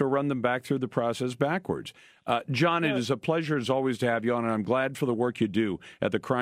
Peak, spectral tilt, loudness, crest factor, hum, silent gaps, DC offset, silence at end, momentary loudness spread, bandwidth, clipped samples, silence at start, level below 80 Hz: -10 dBFS; -6 dB/octave; -28 LUFS; 18 dB; none; none; under 0.1%; 0 s; 5 LU; 15.5 kHz; under 0.1%; 0 s; -66 dBFS